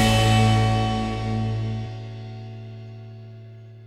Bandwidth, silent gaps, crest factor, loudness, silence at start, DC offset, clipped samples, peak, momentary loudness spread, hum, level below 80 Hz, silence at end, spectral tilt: 13.5 kHz; none; 16 dB; -22 LUFS; 0 s; under 0.1%; under 0.1%; -8 dBFS; 24 LU; none; -36 dBFS; 0 s; -5.5 dB/octave